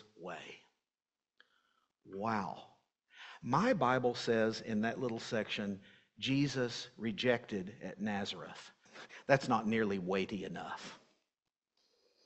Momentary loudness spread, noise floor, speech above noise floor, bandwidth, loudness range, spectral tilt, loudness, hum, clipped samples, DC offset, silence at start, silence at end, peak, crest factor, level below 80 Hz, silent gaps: 19 LU; under -90 dBFS; over 54 dB; 8.4 kHz; 3 LU; -5.5 dB/octave; -36 LUFS; none; under 0.1%; under 0.1%; 0.2 s; 1.3 s; -12 dBFS; 26 dB; -72 dBFS; none